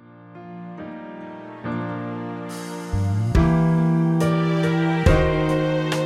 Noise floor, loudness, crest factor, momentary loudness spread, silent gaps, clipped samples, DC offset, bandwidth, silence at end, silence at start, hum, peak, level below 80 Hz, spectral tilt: -42 dBFS; -21 LUFS; 18 dB; 18 LU; none; under 0.1%; under 0.1%; 12.5 kHz; 0 s; 0.1 s; none; -4 dBFS; -32 dBFS; -7.5 dB/octave